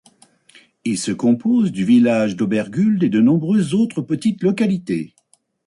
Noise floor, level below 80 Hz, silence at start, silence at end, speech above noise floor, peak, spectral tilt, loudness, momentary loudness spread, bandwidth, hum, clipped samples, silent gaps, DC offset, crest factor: -60 dBFS; -60 dBFS; 0.85 s; 0.6 s; 43 dB; -6 dBFS; -6.5 dB/octave; -18 LUFS; 9 LU; 11.5 kHz; none; under 0.1%; none; under 0.1%; 12 dB